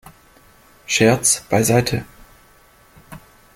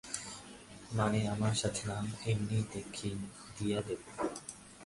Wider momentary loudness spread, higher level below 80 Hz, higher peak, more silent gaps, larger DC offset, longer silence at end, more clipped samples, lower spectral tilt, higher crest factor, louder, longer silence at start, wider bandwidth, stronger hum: second, 9 LU vs 14 LU; first, -48 dBFS vs -58 dBFS; first, -2 dBFS vs -18 dBFS; neither; neither; first, 0.4 s vs 0 s; neither; about the same, -4 dB/octave vs -5 dB/octave; about the same, 20 dB vs 20 dB; first, -17 LUFS vs -37 LUFS; first, 0.9 s vs 0.05 s; first, 17 kHz vs 11.5 kHz; neither